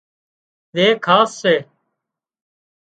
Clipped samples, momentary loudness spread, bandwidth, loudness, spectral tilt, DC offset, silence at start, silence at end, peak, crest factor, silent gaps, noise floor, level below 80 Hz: under 0.1%; 6 LU; 9.2 kHz; -16 LUFS; -4.5 dB/octave; under 0.1%; 0.75 s; 1.25 s; 0 dBFS; 20 dB; none; -81 dBFS; -70 dBFS